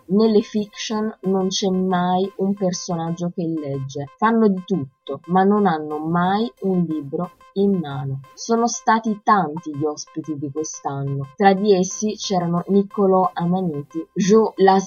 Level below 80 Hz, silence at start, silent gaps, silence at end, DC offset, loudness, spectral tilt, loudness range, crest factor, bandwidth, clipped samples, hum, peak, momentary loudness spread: -62 dBFS; 0.1 s; none; 0 s; under 0.1%; -21 LUFS; -5.5 dB/octave; 3 LU; 20 dB; 7.4 kHz; under 0.1%; none; 0 dBFS; 11 LU